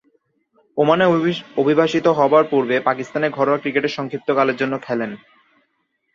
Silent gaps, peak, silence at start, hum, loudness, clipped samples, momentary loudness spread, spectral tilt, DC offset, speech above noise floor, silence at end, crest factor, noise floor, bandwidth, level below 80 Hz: none; -2 dBFS; 0.75 s; none; -18 LUFS; under 0.1%; 10 LU; -6.5 dB/octave; under 0.1%; 52 dB; 1 s; 18 dB; -69 dBFS; 7.4 kHz; -64 dBFS